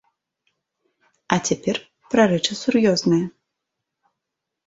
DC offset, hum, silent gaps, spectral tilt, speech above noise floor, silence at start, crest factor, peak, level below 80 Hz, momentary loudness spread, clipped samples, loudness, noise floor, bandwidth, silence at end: under 0.1%; none; none; -4.5 dB/octave; 63 dB; 1.3 s; 22 dB; -2 dBFS; -60 dBFS; 8 LU; under 0.1%; -20 LUFS; -82 dBFS; 8 kHz; 1.35 s